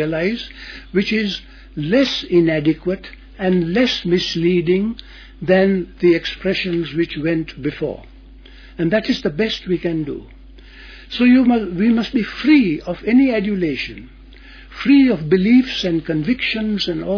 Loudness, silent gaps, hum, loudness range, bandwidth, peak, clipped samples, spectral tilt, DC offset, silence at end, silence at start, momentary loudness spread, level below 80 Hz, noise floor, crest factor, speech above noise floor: -18 LUFS; none; none; 5 LU; 5.4 kHz; -2 dBFS; under 0.1%; -6.5 dB/octave; under 0.1%; 0 s; 0 s; 14 LU; -42 dBFS; -41 dBFS; 16 dB; 23 dB